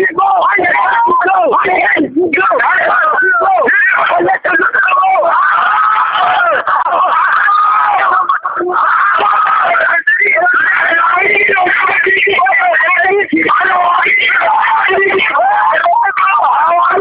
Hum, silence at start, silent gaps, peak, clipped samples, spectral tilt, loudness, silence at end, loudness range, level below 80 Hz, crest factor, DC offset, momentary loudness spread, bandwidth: none; 0 s; none; 0 dBFS; under 0.1%; -7.5 dB/octave; -9 LUFS; 0 s; 1 LU; -56 dBFS; 10 dB; under 0.1%; 2 LU; 5.2 kHz